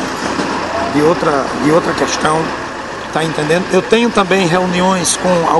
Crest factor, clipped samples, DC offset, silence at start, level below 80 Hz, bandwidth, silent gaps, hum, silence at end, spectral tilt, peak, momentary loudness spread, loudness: 14 dB; under 0.1%; under 0.1%; 0 s; -42 dBFS; 12 kHz; none; none; 0 s; -4 dB/octave; 0 dBFS; 6 LU; -14 LUFS